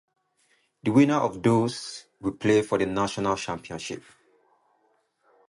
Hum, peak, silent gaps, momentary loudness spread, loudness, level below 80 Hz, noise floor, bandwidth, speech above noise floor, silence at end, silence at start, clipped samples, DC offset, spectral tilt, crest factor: none; -6 dBFS; none; 15 LU; -25 LUFS; -58 dBFS; -69 dBFS; 11.5 kHz; 44 dB; 1.5 s; 0.85 s; under 0.1%; under 0.1%; -6 dB/octave; 20 dB